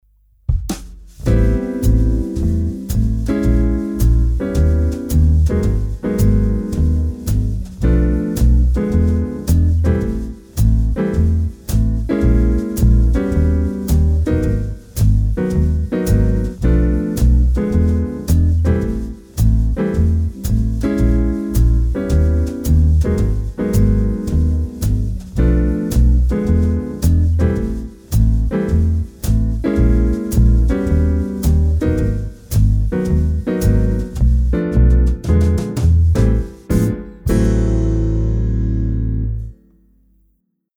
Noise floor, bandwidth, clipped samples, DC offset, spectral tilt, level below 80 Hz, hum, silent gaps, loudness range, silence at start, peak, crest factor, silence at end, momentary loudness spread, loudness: -63 dBFS; over 20 kHz; under 0.1%; under 0.1%; -8 dB/octave; -18 dBFS; none; none; 2 LU; 0.5 s; -4 dBFS; 12 dB; 1.25 s; 6 LU; -17 LUFS